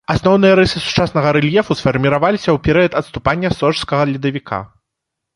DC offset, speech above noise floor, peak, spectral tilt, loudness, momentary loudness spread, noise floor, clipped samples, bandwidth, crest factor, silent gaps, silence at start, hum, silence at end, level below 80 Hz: under 0.1%; 64 dB; 0 dBFS; -6.5 dB/octave; -15 LUFS; 8 LU; -78 dBFS; under 0.1%; 11.5 kHz; 14 dB; none; 0.1 s; none; 0.7 s; -38 dBFS